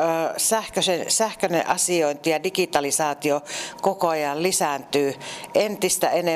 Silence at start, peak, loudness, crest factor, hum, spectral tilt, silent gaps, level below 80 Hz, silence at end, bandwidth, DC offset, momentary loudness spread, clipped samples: 0 s; -6 dBFS; -22 LUFS; 16 dB; none; -2.5 dB/octave; none; -62 dBFS; 0 s; 15.5 kHz; under 0.1%; 5 LU; under 0.1%